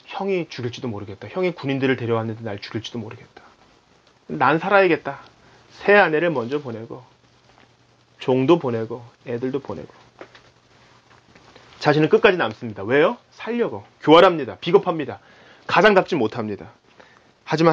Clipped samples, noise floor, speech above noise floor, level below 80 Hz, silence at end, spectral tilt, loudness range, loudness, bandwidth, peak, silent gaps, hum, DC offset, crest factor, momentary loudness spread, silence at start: under 0.1%; -57 dBFS; 37 dB; -62 dBFS; 0 s; -6.5 dB/octave; 8 LU; -20 LUFS; 7.6 kHz; 0 dBFS; none; none; under 0.1%; 22 dB; 19 LU; 0.1 s